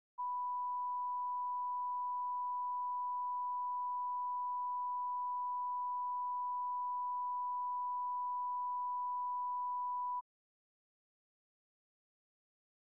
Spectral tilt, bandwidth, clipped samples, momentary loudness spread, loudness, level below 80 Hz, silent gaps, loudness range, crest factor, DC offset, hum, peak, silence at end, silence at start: 3 dB/octave; 1.1 kHz; under 0.1%; 0 LU; -39 LUFS; under -90 dBFS; none; 4 LU; 4 dB; under 0.1%; none; -36 dBFS; 2.8 s; 0.2 s